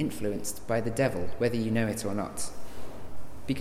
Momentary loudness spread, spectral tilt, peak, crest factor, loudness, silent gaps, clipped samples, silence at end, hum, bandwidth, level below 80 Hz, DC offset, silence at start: 17 LU; -5.5 dB/octave; -12 dBFS; 16 dB; -31 LUFS; none; under 0.1%; 0 s; none; 16.5 kHz; -50 dBFS; under 0.1%; 0 s